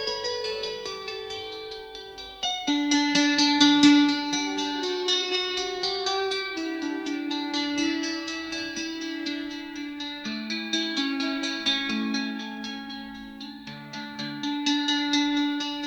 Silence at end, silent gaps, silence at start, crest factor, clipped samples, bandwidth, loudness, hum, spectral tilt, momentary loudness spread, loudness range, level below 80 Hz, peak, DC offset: 0 s; none; 0 s; 22 dB; under 0.1%; 18.5 kHz; -26 LUFS; none; -2 dB/octave; 16 LU; 8 LU; -62 dBFS; -4 dBFS; under 0.1%